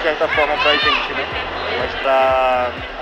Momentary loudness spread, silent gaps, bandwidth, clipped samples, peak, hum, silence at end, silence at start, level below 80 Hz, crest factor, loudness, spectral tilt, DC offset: 8 LU; none; 9.6 kHz; under 0.1%; -2 dBFS; none; 0 s; 0 s; -40 dBFS; 16 dB; -17 LUFS; -4 dB/octave; under 0.1%